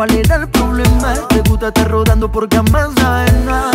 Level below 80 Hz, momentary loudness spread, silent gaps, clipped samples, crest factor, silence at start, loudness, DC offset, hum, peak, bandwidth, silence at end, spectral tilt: -18 dBFS; 2 LU; none; under 0.1%; 12 dB; 0 s; -13 LUFS; under 0.1%; none; 0 dBFS; 16.5 kHz; 0 s; -5.5 dB/octave